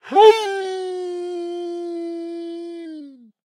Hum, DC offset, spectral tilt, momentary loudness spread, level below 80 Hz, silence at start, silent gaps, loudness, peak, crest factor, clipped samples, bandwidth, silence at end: none; under 0.1%; -2.5 dB/octave; 21 LU; -74 dBFS; 0.05 s; none; -21 LUFS; 0 dBFS; 20 dB; under 0.1%; 11.5 kHz; 0.45 s